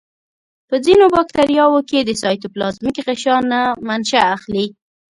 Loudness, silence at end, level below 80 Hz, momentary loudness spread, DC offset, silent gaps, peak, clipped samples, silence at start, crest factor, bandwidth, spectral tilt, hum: -16 LUFS; 0.4 s; -50 dBFS; 11 LU; under 0.1%; none; 0 dBFS; under 0.1%; 0.7 s; 16 dB; 11.5 kHz; -4 dB/octave; none